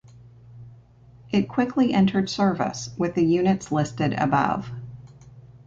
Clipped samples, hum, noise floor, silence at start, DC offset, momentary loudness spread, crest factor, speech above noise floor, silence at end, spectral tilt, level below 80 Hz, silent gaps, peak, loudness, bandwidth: under 0.1%; 60 Hz at -45 dBFS; -50 dBFS; 0.25 s; under 0.1%; 9 LU; 18 dB; 28 dB; 0.1 s; -6.5 dB/octave; -54 dBFS; none; -6 dBFS; -23 LUFS; 7.8 kHz